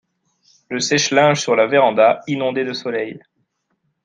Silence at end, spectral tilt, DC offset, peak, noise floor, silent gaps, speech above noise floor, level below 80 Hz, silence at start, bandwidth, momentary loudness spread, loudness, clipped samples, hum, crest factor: 0.85 s; -3.5 dB/octave; under 0.1%; -2 dBFS; -70 dBFS; none; 53 dB; -66 dBFS; 0.7 s; 9.6 kHz; 11 LU; -17 LUFS; under 0.1%; none; 16 dB